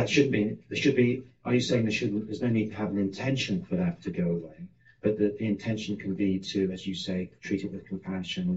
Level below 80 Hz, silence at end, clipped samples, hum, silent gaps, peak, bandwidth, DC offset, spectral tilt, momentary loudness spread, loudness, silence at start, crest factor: -64 dBFS; 0 s; under 0.1%; none; none; -10 dBFS; 8 kHz; 0.1%; -5.5 dB/octave; 9 LU; -29 LUFS; 0 s; 20 dB